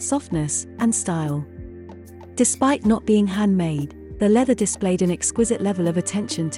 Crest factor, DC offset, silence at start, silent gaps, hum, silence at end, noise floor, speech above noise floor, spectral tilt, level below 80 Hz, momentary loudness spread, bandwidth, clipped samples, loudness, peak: 16 dB; under 0.1%; 0 s; none; none; 0 s; -40 dBFS; 19 dB; -5 dB/octave; -48 dBFS; 15 LU; 12 kHz; under 0.1%; -21 LUFS; -6 dBFS